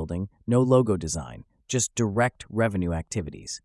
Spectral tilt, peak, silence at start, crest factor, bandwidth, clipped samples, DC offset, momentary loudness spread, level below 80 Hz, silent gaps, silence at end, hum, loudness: -5.5 dB/octave; -6 dBFS; 0 s; 18 dB; 12 kHz; under 0.1%; under 0.1%; 12 LU; -50 dBFS; none; 0.05 s; none; -26 LUFS